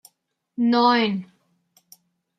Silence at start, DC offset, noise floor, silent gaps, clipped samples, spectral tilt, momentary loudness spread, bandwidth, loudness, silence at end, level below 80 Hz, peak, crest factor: 0.6 s; under 0.1%; -70 dBFS; none; under 0.1%; -6 dB/octave; 15 LU; 13 kHz; -20 LUFS; 1.15 s; -74 dBFS; -8 dBFS; 18 dB